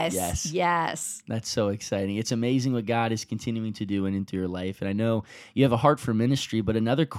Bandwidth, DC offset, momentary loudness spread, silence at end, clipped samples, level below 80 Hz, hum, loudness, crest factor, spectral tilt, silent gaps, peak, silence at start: 16.5 kHz; under 0.1%; 8 LU; 0 s; under 0.1%; -52 dBFS; none; -27 LUFS; 20 dB; -5.5 dB/octave; none; -6 dBFS; 0 s